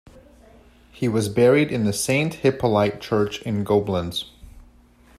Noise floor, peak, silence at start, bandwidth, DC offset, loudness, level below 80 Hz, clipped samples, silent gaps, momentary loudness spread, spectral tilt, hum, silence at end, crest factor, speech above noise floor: -52 dBFS; -6 dBFS; 0.15 s; 15.5 kHz; under 0.1%; -21 LUFS; -50 dBFS; under 0.1%; none; 10 LU; -5.5 dB/octave; none; 0.6 s; 16 dB; 32 dB